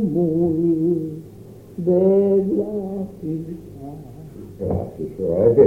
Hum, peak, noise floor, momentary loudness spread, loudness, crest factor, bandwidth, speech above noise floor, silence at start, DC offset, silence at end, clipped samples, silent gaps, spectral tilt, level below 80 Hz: none; -2 dBFS; -41 dBFS; 21 LU; -21 LUFS; 18 dB; 3.2 kHz; 22 dB; 0 s; under 0.1%; 0 s; under 0.1%; none; -11 dB/octave; -48 dBFS